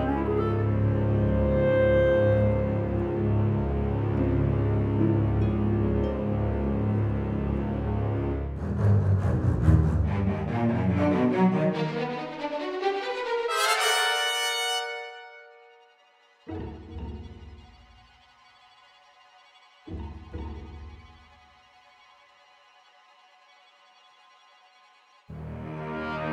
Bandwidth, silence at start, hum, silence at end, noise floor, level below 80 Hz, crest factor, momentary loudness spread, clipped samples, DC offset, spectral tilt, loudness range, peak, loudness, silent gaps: 15.5 kHz; 0 s; none; 0 s; -61 dBFS; -38 dBFS; 20 dB; 18 LU; under 0.1%; under 0.1%; -6 dB/octave; 20 LU; -8 dBFS; -26 LUFS; none